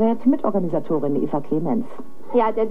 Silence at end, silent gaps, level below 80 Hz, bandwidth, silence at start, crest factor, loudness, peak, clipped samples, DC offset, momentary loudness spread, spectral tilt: 0 s; none; -70 dBFS; 4.8 kHz; 0 s; 14 dB; -22 LUFS; -6 dBFS; under 0.1%; 5%; 6 LU; -10 dB/octave